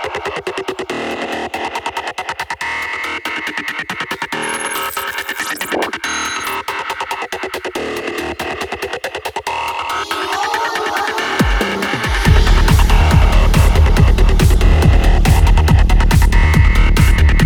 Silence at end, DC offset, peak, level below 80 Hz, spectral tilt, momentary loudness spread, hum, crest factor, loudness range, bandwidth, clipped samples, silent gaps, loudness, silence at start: 0 s; under 0.1%; 0 dBFS; -16 dBFS; -5 dB/octave; 10 LU; none; 14 dB; 9 LU; 19 kHz; under 0.1%; none; -16 LUFS; 0 s